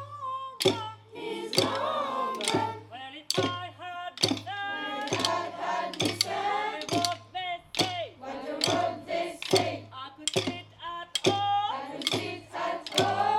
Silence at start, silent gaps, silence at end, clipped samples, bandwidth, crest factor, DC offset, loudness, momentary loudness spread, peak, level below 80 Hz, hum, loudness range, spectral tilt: 0 s; none; 0 s; under 0.1%; 17.5 kHz; 24 dB; under 0.1%; -30 LUFS; 12 LU; -6 dBFS; -70 dBFS; none; 1 LU; -3 dB/octave